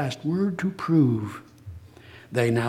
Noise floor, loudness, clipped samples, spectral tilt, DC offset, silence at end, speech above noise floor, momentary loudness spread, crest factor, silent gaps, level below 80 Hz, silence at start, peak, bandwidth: -48 dBFS; -25 LUFS; under 0.1%; -7.5 dB/octave; under 0.1%; 0 s; 24 dB; 23 LU; 18 dB; none; -58 dBFS; 0 s; -8 dBFS; 15 kHz